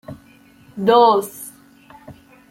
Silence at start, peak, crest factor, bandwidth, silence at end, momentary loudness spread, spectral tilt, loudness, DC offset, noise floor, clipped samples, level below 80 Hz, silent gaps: 0.1 s; -2 dBFS; 18 dB; 16.5 kHz; 0.4 s; 25 LU; -4.5 dB/octave; -15 LUFS; under 0.1%; -49 dBFS; under 0.1%; -62 dBFS; none